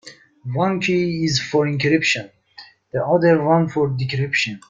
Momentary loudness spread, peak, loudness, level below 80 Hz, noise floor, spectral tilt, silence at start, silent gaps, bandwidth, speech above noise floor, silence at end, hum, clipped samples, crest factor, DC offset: 10 LU; -4 dBFS; -19 LUFS; -56 dBFS; -46 dBFS; -5.5 dB/octave; 0.05 s; none; 9.2 kHz; 27 dB; 0.1 s; none; under 0.1%; 16 dB; under 0.1%